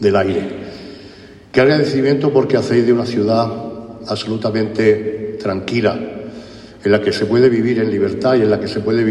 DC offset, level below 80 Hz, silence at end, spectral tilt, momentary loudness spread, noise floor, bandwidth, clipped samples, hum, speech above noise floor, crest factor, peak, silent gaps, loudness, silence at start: under 0.1%; -50 dBFS; 0 s; -7 dB/octave; 17 LU; -39 dBFS; 11.5 kHz; under 0.1%; none; 24 dB; 14 dB; -2 dBFS; none; -16 LUFS; 0 s